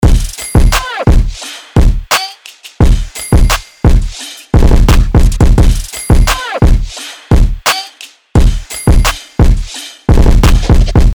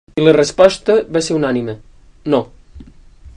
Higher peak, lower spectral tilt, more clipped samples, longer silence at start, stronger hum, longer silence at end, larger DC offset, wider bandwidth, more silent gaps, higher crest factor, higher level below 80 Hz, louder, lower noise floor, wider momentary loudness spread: about the same, 0 dBFS vs 0 dBFS; about the same, -5 dB/octave vs -5 dB/octave; second, under 0.1% vs 0.2%; second, 0 s vs 0.15 s; neither; about the same, 0 s vs 0.05 s; first, 0.6% vs under 0.1%; first, over 20 kHz vs 10.5 kHz; neither; second, 8 dB vs 16 dB; first, -10 dBFS vs -44 dBFS; about the same, -12 LUFS vs -14 LUFS; second, -34 dBFS vs -40 dBFS; second, 11 LU vs 17 LU